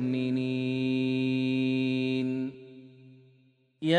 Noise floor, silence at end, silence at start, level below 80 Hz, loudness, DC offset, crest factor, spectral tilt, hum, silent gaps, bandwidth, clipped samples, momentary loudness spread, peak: -65 dBFS; 0 s; 0 s; -72 dBFS; -29 LUFS; under 0.1%; 18 dB; -7.5 dB/octave; none; none; 9.2 kHz; under 0.1%; 8 LU; -10 dBFS